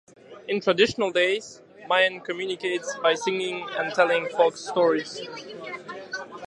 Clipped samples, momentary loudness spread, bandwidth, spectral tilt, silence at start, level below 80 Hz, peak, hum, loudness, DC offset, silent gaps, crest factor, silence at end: under 0.1%; 15 LU; 11 kHz; -3.5 dB/octave; 0.3 s; -70 dBFS; -6 dBFS; none; -24 LUFS; under 0.1%; none; 20 dB; 0 s